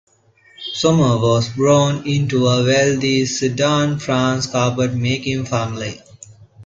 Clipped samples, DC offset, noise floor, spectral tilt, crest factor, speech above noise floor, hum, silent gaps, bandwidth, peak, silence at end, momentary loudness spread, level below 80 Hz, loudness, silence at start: under 0.1%; under 0.1%; -53 dBFS; -5 dB/octave; 16 dB; 36 dB; none; none; 7.8 kHz; -2 dBFS; 0 s; 9 LU; -48 dBFS; -17 LUFS; 0.6 s